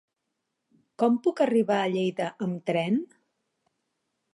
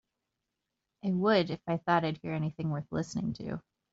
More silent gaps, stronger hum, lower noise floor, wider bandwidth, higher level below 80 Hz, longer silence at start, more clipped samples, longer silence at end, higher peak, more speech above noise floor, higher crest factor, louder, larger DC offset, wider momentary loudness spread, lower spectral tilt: neither; neither; second, -82 dBFS vs -86 dBFS; first, 11.5 kHz vs 8 kHz; second, -80 dBFS vs -64 dBFS; about the same, 1 s vs 1.05 s; neither; first, 1.3 s vs 0.35 s; about the same, -10 dBFS vs -12 dBFS; about the same, 56 dB vs 55 dB; about the same, 18 dB vs 20 dB; first, -26 LUFS vs -32 LUFS; neither; second, 7 LU vs 12 LU; first, -7 dB/octave vs -5.5 dB/octave